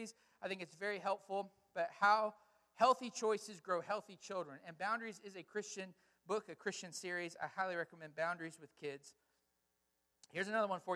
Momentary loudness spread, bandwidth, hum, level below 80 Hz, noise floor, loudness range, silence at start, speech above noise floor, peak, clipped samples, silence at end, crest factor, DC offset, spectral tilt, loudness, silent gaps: 15 LU; 14.5 kHz; none; -90 dBFS; -84 dBFS; 7 LU; 0 s; 43 dB; -20 dBFS; under 0.1%; 0 s; 22 dB; under 0.1%; -3.5 dB/octave; -41 LUFS; none